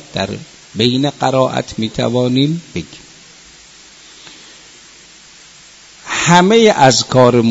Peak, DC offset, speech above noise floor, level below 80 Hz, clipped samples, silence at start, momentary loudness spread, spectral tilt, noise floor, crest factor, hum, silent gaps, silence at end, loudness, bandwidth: 0 dBFS; under 0.1%; 29 dB; -48 dBFS; 0.1%; 0.15 s; 21 LU; -4.5 dB/octave; -41 dBFS; 16 dB; none; none; 0 s; -13 LUFS; 8.4 kHz